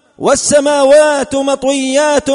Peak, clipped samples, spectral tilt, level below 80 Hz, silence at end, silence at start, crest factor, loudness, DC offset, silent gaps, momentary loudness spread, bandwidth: 0 dBFS; under 0.1%; -2.5 dB/octave; -44 dBFS; 0 s; 0.2 s; 10 dB; -11 LUFS; under 0.1%; none; 6 LU; 11 kHz